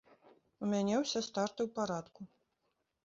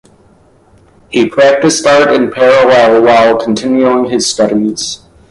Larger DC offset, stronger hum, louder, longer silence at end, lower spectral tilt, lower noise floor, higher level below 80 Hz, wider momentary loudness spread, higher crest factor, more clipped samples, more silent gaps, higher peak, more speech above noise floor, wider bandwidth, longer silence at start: neither; neither; second, -36 LUFS vs -9 LUFS; first, 0.8 s vs 0.35 s; about the same, -4.5 dB/octave vs -3.5 dB/octave; first, -82 dBFS vs -45 dBFS; second, -76 dBFS vs -48 dBFS; first, 21 LU vs 9 LU; first, 18 dB vs 10 dB; neither; neither; second, -20 dBFS vs 0 dBFS; first, 47 dB vs 37 dB; second, 7.6 kHz vs 11.5 kHz; second, 0.6 s vs 1.1 s